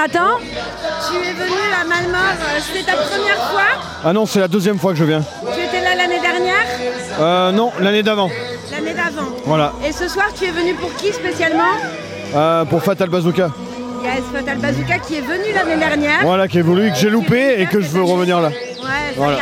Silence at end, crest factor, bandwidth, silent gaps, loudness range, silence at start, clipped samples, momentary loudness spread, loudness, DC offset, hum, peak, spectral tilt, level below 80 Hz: 0 s; 14 dB; 16.5 kHz; none; 3 LU; 0 s; under 0.1%; 7 LU; -16 LUFS; under 0.1%; none; -2 dBFS; -5 dB/octave; -44 dBFS